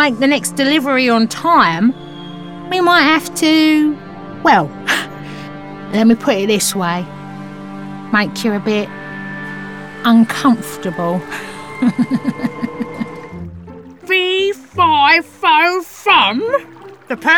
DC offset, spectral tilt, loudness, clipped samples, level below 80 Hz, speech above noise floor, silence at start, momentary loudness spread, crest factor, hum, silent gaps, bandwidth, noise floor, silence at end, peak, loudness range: under 0.1%; -4 dB/octave; -14 LUFS; under 0.1%; -52 dBFS; 21 dB; 0 s; 19 LU; 14 dB; none; none; 18 kHz; -35 dBFS; 0 s; -2 dBFS; 6 LU